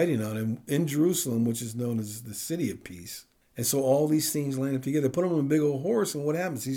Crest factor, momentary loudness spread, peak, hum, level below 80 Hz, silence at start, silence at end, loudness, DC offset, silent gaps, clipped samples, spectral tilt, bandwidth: 14 dB; 12 LU; -12 dBFS; none; -68 dBFS; 0 s; 0 s; -27 LUFS; under 0.1%; none; under 0.1%; -5.5 dB/octave; over 20 kHz